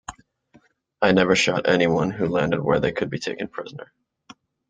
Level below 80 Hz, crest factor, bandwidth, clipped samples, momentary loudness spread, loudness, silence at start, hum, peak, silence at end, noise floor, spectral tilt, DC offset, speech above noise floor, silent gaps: -54 dBFS; 20 dB; 9.2 kHz; under 0.1%; 17 LU; -21 LUFS; 0.1 s; none; -2 dBFS; 0.85 s; -58 dBFS; -5 dB/octave; under 0.1%; 37 dB; none